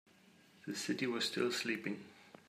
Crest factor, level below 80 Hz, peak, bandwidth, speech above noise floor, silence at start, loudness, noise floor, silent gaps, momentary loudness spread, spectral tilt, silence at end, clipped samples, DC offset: 18 dB; -86 dBFS; -22 dBFS; 15.5 kHz; 27 dB; 0.65 s; -38 LUFS; -65 dBFS; none; 14 LU; -3.5 dB/octave; 0.2 s; under 0.1%; under 0.1%